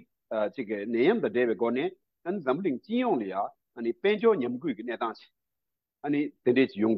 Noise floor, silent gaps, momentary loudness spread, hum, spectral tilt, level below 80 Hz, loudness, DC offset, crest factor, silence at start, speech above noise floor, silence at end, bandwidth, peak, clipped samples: -88 dBFS; none; 10 LU; none; -9 dB/octave; -80 dBFS; -29 LUFS; under 0.1%; 16 dB; 0.3 s; 61 dB; 0 s; 5.6 kHz; -12 dBFS; under 0.1%